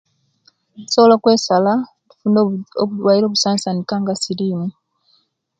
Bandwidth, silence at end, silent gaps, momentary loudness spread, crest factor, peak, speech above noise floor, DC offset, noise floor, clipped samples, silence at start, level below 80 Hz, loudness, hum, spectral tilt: 9.4 kHz; 0.9 s; none; 10 LU; 18 dB; 0 dBFS; 45 dB; under 0.1%; -61 dBFS; under 0.1%; 0.8 s; -64 dBFS; -16 LUFS; none; -5 dB/octave